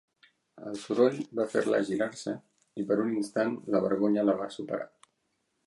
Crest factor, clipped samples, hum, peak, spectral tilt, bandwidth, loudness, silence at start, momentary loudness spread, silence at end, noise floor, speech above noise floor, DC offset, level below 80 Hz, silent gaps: 20 dB; under 0.1%; none; -10 dBFS; -6 dB/octave; 11.5 kHz; -29 LUFS; 0.55 s; 14 LU; 0.8 s; -77 dBFS; 49 dB; under 0.1%; -74 dBFS; none